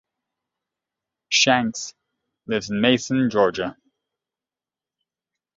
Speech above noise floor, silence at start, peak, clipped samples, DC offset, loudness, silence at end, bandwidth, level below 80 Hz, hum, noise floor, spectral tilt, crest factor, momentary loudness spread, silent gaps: over 69 dB; 1.3 s; -2 dBFS; under 0.1%; under 0.1%; -20 LUFS; 1.85 s; 7.8 kHz; -60 dBFS; none; under -90 dBFS; -3.5 dB/octave; 22 dB; 14 LU; none